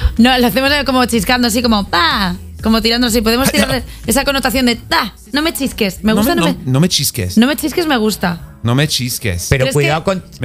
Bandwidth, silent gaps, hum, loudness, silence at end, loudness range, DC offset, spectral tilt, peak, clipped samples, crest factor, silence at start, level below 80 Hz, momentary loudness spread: 16.5 kHz; none; none; -14 LUFS; 0 s; 2 LU; under 0.1%; -4 dB/octave; 0 dBFS; under 0.1%; 14 dB; 0 s; -30 dBFS; 5 LU